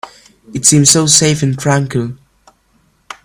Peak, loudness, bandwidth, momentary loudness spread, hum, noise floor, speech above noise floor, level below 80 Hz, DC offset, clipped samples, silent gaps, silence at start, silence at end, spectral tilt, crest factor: 0 dBFS; -10 LUFS; over 20 kHz; 14 LU; none; -56 dBFS; 44 dB; -48 dBFS; under 0.1%; 0.2%; none; 0.05 s; 0.1 s; -3.5 dB/octave; 14 dB